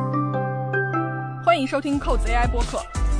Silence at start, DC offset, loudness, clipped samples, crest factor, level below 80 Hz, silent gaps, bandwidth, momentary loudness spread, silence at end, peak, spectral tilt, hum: 0 s; under 0.1%; -23 LUFS; under 0.1%; 18 dB; -28 dBFS; none; 10.5 kHz; 6 LU; 0 s; -4 dBFS; -6 dB/octave; none